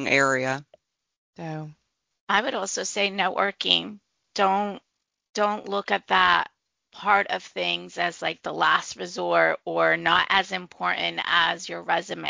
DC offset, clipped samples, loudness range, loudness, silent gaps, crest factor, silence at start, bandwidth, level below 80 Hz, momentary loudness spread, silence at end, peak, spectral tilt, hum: under 0.1%; under 0.1%; 3 LU; -24 LUFS; 1.17-1.33 s, 2.20-2.27 s, 5.29-5.34 s; 22 dB; 0 s; 7.8 kHz; -66 dBFS; 14 LU; 0 s; -2 dBFS; -2.5 dB/octave; none